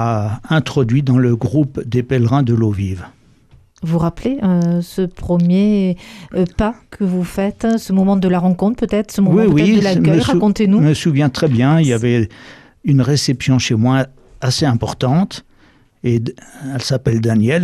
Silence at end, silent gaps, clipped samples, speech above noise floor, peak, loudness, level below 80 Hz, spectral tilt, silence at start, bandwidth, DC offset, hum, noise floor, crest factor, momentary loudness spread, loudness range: 0 s; none; under 0.1%; 36 dB; -2 dBFS; -16 LUFS; -40 dBFS; -7 dB/octave; 0 s; 13.5 kHz; under 0.1%; none; -50 dBFS; 12 dB; 9 LU; 5 LU